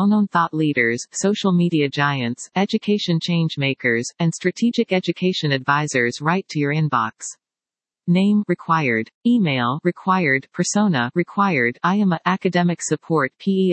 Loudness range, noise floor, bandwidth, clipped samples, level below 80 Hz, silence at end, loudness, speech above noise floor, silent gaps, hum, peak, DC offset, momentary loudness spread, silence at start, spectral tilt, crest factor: 2 LU; under -90 dBFS; 8.8 kHz; under 0.1%; -70 dBFS; 0 s; -20 LUFS; over 71 dB; 9.14-9.21 s; none; -2 dBFS; under 0.1%; 4 LU; 0 s; -5.5 dB/octave; 18 dB